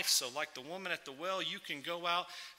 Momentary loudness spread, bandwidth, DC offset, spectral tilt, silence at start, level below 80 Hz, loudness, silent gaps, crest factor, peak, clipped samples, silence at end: 9 LU; 16 kHz; under 0.1%; -0.5 dB/octave; 0 s; -86 dBFS; -37 LUFS; none; 22 dB; -16 dBFS; under 0.1%; 0.05 s